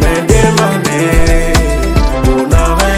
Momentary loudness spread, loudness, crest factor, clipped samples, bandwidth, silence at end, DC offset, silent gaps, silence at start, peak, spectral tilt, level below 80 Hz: 3 LU; -11 LUFS; 10 dB; 0.7%; 16 kHz; 0 s; under 0.1%; none; 0 s; 0 dBFS; -5 dB/octave; -14 dBFS